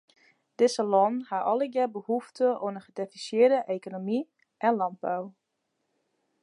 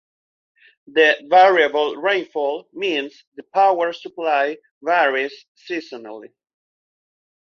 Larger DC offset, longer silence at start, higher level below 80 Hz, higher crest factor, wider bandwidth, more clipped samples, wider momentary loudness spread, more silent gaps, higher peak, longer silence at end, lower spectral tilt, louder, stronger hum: neither; second, 0.6 s vs 0.95 s; second, -86 dBFS vs -74 dBFS; about the same, 18 dB vs 18 dB; first, 11 kHz vs 6.8 kHz; neither; second, 12 LU vs 16 LU; second, none vs 3.27-3.32 s, 4.71-4.81 s, 5.48-5.55 s; second, -10 dBFS vs -2 dBFS; second, 1.1 s vs 1.3 s; first, -5 dB/octave vs -3.5 dB/octave; second, -28 LUFS vs -19 LUFS; neither